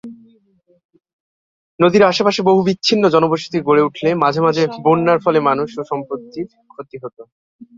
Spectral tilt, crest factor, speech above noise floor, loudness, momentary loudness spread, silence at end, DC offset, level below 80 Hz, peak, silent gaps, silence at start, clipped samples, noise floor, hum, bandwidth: -6 dB/octave; 16 dB; 42 dB; -15 LUFS; 18 LU; 0.15 s; under 0.1%; -60 dBFS; 0 dBFS; 0.85-0.89 s, 1.13-1.78 s, 7.32-7.59 s; 0.05 s; under 0.1%; -57 dBFS; none; 7.8 kHz